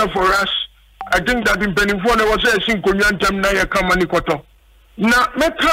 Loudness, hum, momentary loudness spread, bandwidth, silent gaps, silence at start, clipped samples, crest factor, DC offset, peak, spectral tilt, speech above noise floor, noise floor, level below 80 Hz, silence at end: -16 LUFS; none; 6 LU; 16 kHz; none; 0 s; under 0.1%; 14 dB; under 0.1%; -4 dBFS; -4 dB/octave; 33 dB; -49 dBFS; -34 dBFS; 0 s